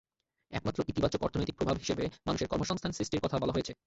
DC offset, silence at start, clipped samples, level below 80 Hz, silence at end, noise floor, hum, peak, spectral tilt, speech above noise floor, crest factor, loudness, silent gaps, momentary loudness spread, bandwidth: under 0.1%; 0.5 s; under 0.1%; -50 dBFS; 0.1 s; -58 dBFS; none; -14 dBFS; -5.5 dB/octave; 25 dB; 20 dB; -33 LUFS; none; 3 LU; 8.2 kHz